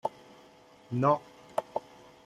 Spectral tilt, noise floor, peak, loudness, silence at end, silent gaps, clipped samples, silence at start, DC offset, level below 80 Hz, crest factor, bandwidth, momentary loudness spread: -8 dB/octave; -57 dBFS; -12 dBFS; -32 LUFS; 0.45 s; none; under 0.1%; 0.05 s; under 0.1%; -72 dBFS; 22 dB; 13.5 kHz; 12 LU